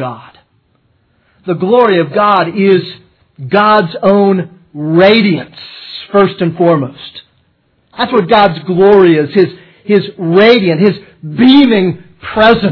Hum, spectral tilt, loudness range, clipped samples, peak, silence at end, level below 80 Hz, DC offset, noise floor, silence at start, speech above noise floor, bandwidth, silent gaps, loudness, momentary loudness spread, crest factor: none; -8.5 dB/octave; 4 LU; 0.8%; 0 dBFS; 0 s; -46 dBFS; under 0.1%; -56 dBFS; 0 s; 47 dB; 5.4 kHz; none; -10 LUFS; 18 LU; 10 dB